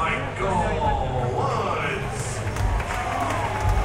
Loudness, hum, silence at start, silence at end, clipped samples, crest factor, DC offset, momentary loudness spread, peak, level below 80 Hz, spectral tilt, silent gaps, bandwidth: -25 LUFS; none; 0 s; 0 s; under 0.1%; 14 dB; under 0.1%; 4 LU; -10 dBFS; -32 dBFS; -5.5 dB/octave; none; 16 kHz